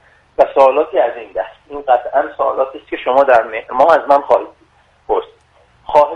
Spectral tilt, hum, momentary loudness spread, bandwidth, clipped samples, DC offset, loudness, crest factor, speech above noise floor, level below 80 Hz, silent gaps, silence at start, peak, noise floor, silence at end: -5 dB/octave; none; 13 LU; 7.6 kHz; under 0.1%; under 0.1%; -14 LUFS; 14 dB; 38 dB; -52 dBFS; none; 0.4 s; 0 dBFS; -52 dBFS; 0 s